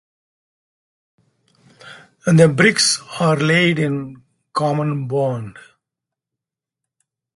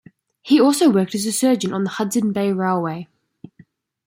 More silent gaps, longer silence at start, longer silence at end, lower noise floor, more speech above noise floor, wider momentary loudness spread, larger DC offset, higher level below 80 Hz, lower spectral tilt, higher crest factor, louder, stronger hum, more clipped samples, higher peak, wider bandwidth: neither; first, 1.85 s vs 0.45 s; first, 1.75 s vs 1.05 s; first, -85 dBFS vs -52 dBFS; first, 69 dB vs 35 dB; first, 14 LU vs 8 LU; neither; first, -60 dBFS vs -66 dBFS; about the same, -4.5 dB/octave vs -5 dB/octave; about the same, 20 dB vs 16 dB; about the same, -17 LUFS vs -18 LUFS; neither; neither; first, 0 dBFS vs -4 dBFS; second, 11.5 kHz vs 16.5 kHz